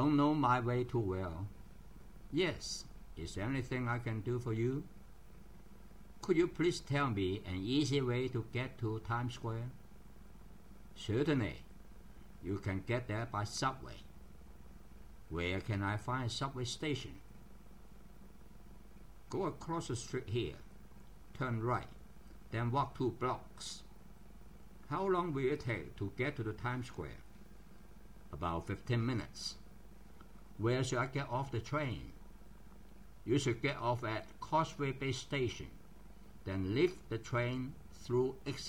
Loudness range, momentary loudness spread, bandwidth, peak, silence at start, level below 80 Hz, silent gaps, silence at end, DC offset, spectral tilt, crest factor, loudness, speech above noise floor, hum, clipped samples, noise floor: 6 LU; 25 LU; 16 kHz; -18 dBFS; 0 s; -58 dBFS; none; 0 s; 0.2%; -6 dB/octave; 20 dB; -38 LUFS; 21 dB; none; under 0.1%; -57 dBFS